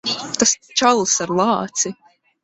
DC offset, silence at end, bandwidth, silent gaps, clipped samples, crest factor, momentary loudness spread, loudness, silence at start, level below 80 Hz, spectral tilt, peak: under 0.1%; 0.5 s; 8.4 kHz; none; under 0.1%; 18 dB; 7 LU; -18 LUFS; 0.05 s; -58 dBFS; -2 dB/octave; -2 dBFS